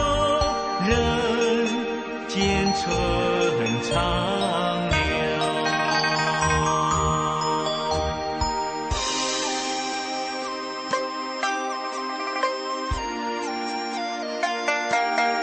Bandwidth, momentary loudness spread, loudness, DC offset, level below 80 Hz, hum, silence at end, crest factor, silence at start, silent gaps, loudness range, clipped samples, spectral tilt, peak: 8.8 kHz; 7 LU; -24 LUFS; under 0.1%; -38 dBFS; none; 0 s; 16 dB; 0 s; none; 5 LU; under 0.1%; -4 dB/octave; -8 dBFS